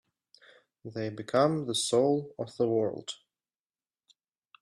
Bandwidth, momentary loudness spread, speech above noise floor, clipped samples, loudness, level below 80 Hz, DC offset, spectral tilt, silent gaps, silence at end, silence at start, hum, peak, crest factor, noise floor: 13 kHz; 16 LU; over 61 dB; under 0.1%; -29 LUFS; -74 dBFS; under 0.1%; -5 dB/octave; none; 1.45 s; 0.85 s; none; -12 dBFS; 20 dB; under -90 dBFS